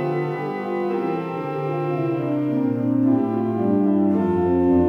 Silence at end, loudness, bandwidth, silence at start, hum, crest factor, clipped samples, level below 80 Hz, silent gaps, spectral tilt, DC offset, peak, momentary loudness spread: 0 s; -22 LUFS; 5.6 kHz; 0 s; none; 12 dB; under 0.1%; -50 dBFS; none; -10.5 dB/octave; under 0.1%; -8 dBFS; 7 LU